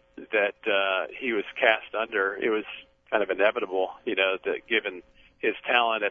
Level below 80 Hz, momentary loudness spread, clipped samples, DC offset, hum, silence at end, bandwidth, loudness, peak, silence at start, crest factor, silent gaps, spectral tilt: -68 dBFS; 7 LU; under 0.1%; under 0.1%; none; 0 s; 5 kHz; -26 LUFS; -4 dBFS; 0.15 s; 22 dB; none; -5.5 dB/octave